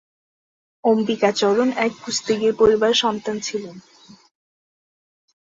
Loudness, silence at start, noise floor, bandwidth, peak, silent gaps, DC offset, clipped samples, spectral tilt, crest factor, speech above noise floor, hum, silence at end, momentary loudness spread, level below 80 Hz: -19 LUFS; 0.85 s; under -90 dBFS; 8 kHz; -4 dBFS; none; under 0.1%; under 0.1%; -3.5 dB/octave; 18 dB; over 71 dB; none; 1.8 s; 10 LU; -56 dBFS